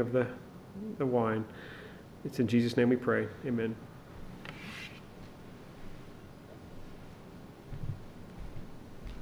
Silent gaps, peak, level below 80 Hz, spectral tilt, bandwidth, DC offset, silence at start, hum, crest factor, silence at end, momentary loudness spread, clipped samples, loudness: none; -14 dBFS; -52 dBFS; -7.5 dB/octave; over 20 kHz; under 0.1%; 0 s; none; 22 dB; 0 s; 22 LU; under 0.1%; -33 LUFS